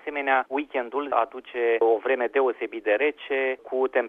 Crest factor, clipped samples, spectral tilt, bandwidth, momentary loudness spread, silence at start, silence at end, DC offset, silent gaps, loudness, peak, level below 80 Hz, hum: 18 dB; under 0.1%; -5 dB/octave; 3.9 kHz; 6 LU; 0.05 s; 0 s; under 0.1%; none; -25 LUFS; -6 dBFS; -70 dBFS; none